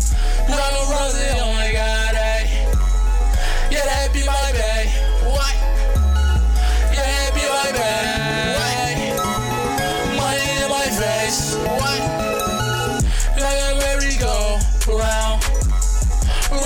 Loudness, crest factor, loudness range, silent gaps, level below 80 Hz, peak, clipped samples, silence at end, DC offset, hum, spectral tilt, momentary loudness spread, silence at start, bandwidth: -19 LUFS; 10 dB; 1 LU; none; -18 dBFS; -8 dBFS; under 0.1%; 0 s; under 0.1%; none; -3.5 dB/octave; 2 LU; 0 s; 17.5 kHz